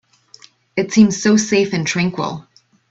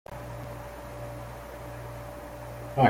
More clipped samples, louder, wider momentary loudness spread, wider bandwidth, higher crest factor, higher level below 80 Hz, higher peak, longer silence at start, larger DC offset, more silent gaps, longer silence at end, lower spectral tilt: neither; first, -16 LUFS vs -40 LUFS; first, 13 LU vs 2 LU; second, 8 kHz vs 16.5 kHz; second, 18 dB vs 24 dB; second, -58 dBFS vs -48 dBFS; first, 0 dBFS vs -8 dBFS; first, 0.75 s vs 0.1 s; neither; neither; first, 0.5 s vs 0 s; second, -5 dB/octave vs -7 dB/octave